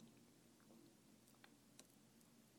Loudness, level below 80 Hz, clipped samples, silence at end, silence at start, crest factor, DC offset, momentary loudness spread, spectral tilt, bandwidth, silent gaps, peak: -68 LUFS; under -90 dBFS; under 0.1%; 0 s; 0 s; 32 dB; under 0.1%; 3 LU; -3.5 dB/octave; 19 kHz; none; -36 dBFS